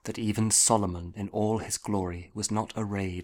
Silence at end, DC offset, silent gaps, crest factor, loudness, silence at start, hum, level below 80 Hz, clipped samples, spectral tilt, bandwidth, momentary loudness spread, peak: 0 s; under 0.1%; none; 20 dB; -27 LUFS; 0.05 s; none; -54 dBFS; under 0.1%; -4 dB/octave; 18 kHz; 13 LU; -8 dBFS